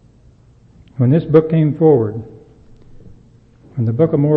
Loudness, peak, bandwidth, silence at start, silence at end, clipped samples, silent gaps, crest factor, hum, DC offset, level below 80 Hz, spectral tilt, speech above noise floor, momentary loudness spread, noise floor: -15 LUFS; 0 dBFS; 4.3 kHz; 1 s; 0 s; under 0.1%; none; 16 dB; none; under 0.1%; -48 dBFS; -12 dB/octave; 34 dB; 18 LU; -47 dBFS